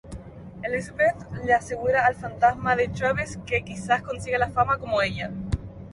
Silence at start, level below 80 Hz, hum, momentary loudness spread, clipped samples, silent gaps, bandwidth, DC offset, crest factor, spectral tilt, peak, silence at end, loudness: 0.05 s; -44 dBFS; none; 10 LU; under 0.1%; none; 11.5 kHz; under 0.1%; 18 dB; -5.5 dB/octave; -6 dBFS; 0 s; -25 LUFS